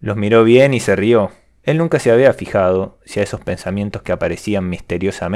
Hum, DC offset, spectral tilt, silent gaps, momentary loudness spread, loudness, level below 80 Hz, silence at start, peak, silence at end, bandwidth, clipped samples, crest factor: none; under 0.1%; -6.5 dB/octave; none; 12 LU; -16 LUFS; -44 dBFS; 0 s; 0 dBFS; 0 s; 13.5 kHz; under 0.1%; 16 dB